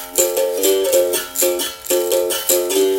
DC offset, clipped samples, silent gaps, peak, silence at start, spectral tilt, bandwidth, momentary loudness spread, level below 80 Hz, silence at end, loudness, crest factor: under 0.1%; under 0.1%; none; 0 dBFS; 0 s; -0.5 dB/octave; 16.5 kHz; 4 LU; -56 dBFS; 0 s; -17 LUFS; 18 dB